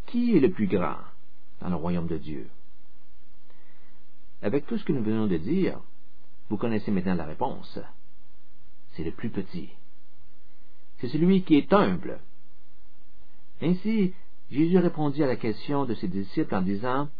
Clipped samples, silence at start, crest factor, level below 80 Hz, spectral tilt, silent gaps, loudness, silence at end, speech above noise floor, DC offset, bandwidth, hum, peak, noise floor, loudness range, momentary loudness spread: under 0.1%; 0.1 s; 22 dB; -56 dBFS; -10.5 dB/octave; none; -27 LUFS; 0.1 s; 36 dB; 5%; 5 kHz; none; -6 dBFS; -62 dBFS; 10 LU; 17 LU